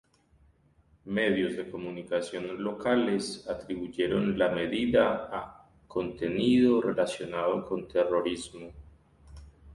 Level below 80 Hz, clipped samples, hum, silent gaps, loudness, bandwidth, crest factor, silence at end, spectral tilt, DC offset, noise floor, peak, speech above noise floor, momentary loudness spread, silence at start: -56 dBFS; under 0.1%; none; none; -29 LUFS; 11.5 kHz; 18 dB; 0 s; -5.5 dB/octave; under 0.1%; -64 dBFS; -12 dBFS; 36 dB; 13 LU; 1.05 s